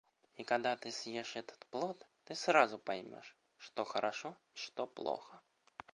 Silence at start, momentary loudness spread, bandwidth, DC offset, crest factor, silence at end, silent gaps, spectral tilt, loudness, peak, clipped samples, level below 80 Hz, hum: 0.4 s; 21 LU; 11 kHz; under 0.1%; 28 dB; 0.55 s; none; -3 dB/octave; -38 LUFS; -12 dBFS; under 0.1%; -86 dBFS; none